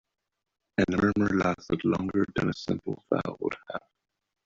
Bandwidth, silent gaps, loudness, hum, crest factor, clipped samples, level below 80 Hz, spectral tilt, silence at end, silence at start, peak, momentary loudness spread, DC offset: 7.6 kHz; none; -28 LUFS; none; 20 dB; under 0.1%; -54 dBFS; -7 dB/octave; 0.65 s; 0.8 s; -10 dBFS; 9 LU; under 0.1%